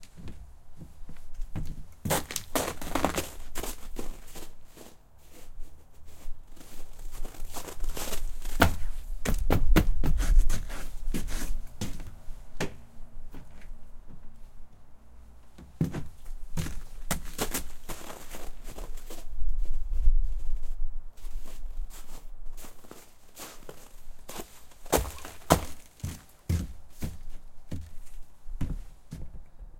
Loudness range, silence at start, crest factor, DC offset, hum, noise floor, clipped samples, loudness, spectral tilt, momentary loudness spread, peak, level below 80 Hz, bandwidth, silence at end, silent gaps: 15 LU; 0 s; 26 dB; under 0.1%; none; -49 dBFS; under 0.1%; -34 LUFS; -4.5 dB/octave; 23 LU; -2 dBFS; -32 dBFS; 16.5 kHz; 0 s; none